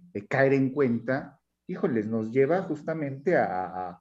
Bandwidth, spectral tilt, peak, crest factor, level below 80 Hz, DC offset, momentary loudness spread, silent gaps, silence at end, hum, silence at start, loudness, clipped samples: 7.8 kHz; -9 dB/octave; -10 dBFS; 18 dB; -72 dBFS; under 0.1%; 9 LU; none; 0.05 s; none; 0.15 s; -27 LUFS; under 0.1%